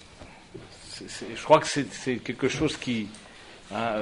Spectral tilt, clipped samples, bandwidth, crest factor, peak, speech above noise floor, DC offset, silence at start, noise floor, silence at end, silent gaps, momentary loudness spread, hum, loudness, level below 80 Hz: -4.5 dB/octave; under 0.1%; 11 kHz; 24 dB; -4 dBFS; 21 dB; under 0.1%; 0 s; -48 dBFS; 0 s; none; 25 LU; none; -27 LUFS; -56 dBFS